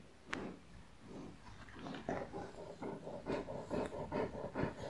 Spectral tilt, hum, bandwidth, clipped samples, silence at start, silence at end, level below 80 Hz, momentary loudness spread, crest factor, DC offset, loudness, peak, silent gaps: -6.5 dB/octave; none; 11.5 kHz; under 0.1%; 0 s; 0 s; -62 dBFS; 13 LU; 26 dB; 0.1%; -45 LUFS; -20 dBFS; none